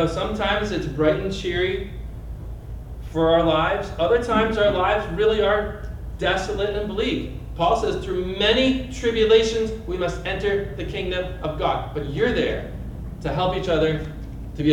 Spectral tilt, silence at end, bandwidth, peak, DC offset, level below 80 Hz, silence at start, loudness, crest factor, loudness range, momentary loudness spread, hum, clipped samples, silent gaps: -5.5 dB/octave; 0 s; 16 kHz; -6 dBFS; under 0.1%; -34 dBFS; 0 s; -22 LUFS; 16 dB; 4 LU; 16 LU; none; under 0.1%; none